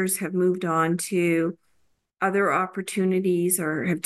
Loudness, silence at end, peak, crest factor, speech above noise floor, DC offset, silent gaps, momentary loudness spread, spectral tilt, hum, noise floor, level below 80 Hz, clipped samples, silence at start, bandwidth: -24 LUFS; 0.05 s; -10 dBFS; 14 dB; 45 dB; under 0.1%; none; 4 LU; -5 dB/octave; none; -68 dBFS; -72 dBFS; under 0.1%; 0 s; 13 kHz